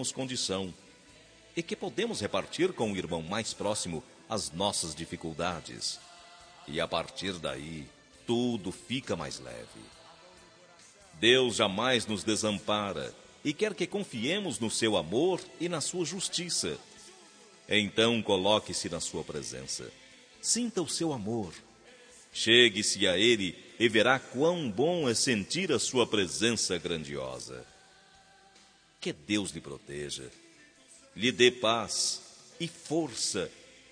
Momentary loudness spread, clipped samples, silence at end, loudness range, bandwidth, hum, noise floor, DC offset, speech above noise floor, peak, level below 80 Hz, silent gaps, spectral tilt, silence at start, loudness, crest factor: 16 LU; under 0.1%; 0.3 s; 10 LU; 10.5 kHz; none; -60 dBFS; under 0.1%; 30 dB; -6 dBFS; -64 dBFS; none; -3 dB/octave; 0 s; -30 LUFS; 24 dB